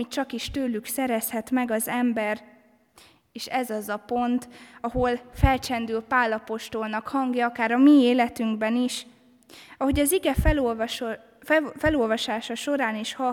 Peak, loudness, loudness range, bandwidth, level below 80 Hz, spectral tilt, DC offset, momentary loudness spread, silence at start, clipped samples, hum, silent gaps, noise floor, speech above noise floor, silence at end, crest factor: -6 dBFS; -25 LUFS; 6 LU; 18.5 kHz; -38 dBFS; -5 dB/octave; under 0.1%; 9 LU; 0 s; under 0.1%; none; none; -56 dBFS; 32 dB; 0 s; 20 dB